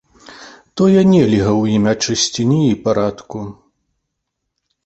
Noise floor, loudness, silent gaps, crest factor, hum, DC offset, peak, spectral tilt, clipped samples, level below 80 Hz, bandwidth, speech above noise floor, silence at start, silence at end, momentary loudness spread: -75 dBFS; -14 LUFS; none; 14 dB; none; under 0.1%; -2 dBFS; -5.5 dB/octave; under 0.1%; -46 dBFS; 8.2 kHz; 61 dB; 0.3 s; 1.35 s; 18 LU